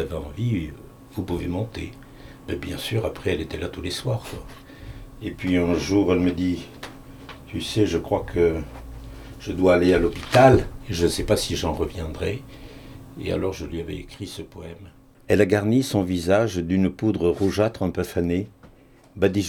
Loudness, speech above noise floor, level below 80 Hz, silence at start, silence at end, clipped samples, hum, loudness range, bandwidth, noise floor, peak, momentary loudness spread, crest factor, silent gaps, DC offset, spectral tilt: -23 LUFS; 28 dB; -42 dBFS; 0 s; 0 s; under 0.1%; none; 9 LU; 20 kHz; -51 dBFS; -2 dBFS; 21 LU; 22 dB; none; under 0.1%; -6 dB/octave